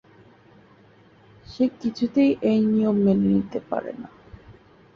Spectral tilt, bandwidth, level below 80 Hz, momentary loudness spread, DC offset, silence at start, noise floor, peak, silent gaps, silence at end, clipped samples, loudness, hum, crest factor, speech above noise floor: -9 dB/octave; 6.8 kHz; -56 dBFS; 17 LU; under 0.1%; 1.5 s; -54 dBFS; -10 dBFS; none; 0.45 s; under 0.1%; -22 LUFS; none; 16 dB; 32 dB